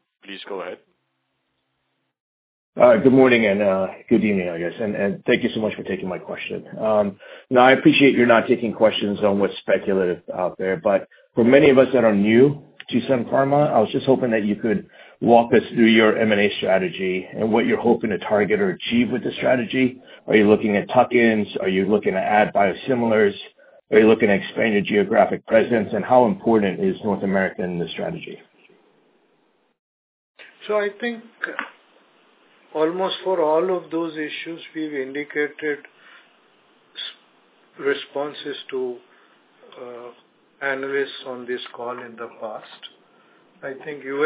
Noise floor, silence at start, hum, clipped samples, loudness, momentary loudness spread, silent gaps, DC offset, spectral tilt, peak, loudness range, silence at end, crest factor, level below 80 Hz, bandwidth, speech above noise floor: -73 dBFS; 0.3 s; none; under 0.1%; -19 LUFS; 17 LU; 2.20-2.73 s, 29.79-30.35 s; under 0.1%; -10 dB/octave; 0 dBFS; 13 LU; 0 s; 20 dB; -58 dBFS; 4 kHz; 54 dB